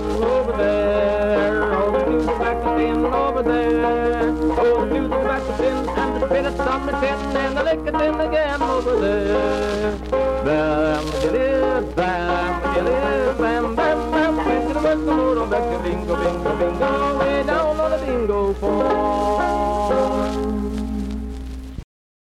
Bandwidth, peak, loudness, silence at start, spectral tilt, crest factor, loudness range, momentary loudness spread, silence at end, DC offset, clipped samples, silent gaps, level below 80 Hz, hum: 13 kHz; -8 dBFS; -20 LUFS; 0 s; -6.5 dB/octave; 10 dB; 2 LU; 4 LU; 0.5 s; under 0.1%; under 0.1%; none; -32 dBFS; none